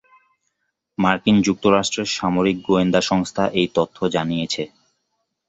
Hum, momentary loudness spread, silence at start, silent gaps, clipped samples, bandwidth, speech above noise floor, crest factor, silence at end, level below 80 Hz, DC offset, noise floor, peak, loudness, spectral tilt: none; 7 LU; 1 s; none; under 0.1%; 8.2 kHz; 55 dB; 18 dB; 0.85 s; -52 dBFS; under 0.1%; -74 dBFS; -2 dBFS; -19 LUFS; -5 dB/octave